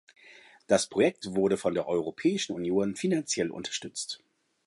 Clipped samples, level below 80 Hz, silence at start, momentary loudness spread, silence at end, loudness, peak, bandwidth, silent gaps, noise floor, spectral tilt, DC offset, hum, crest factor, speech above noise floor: under 0.1%; -66 dBFS; 0.3 s; 9 LU; 0.5 s; -29 LUFS; -8 dBFS; 11.5 kHz; none; -55 dBFS; -4 dB/octave; under 0.1%; none; 22 dB; 26 dB